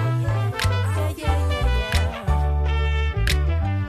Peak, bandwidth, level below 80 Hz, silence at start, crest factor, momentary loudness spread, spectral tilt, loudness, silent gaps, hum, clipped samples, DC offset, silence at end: -6 dBFS; 14 kHz; -24 dBFS; 0 s; 14 dB; 2 LU; -5.5 dB/octave; -23 LUFS; none; none; under 0.1%; under 0.1%; 0 s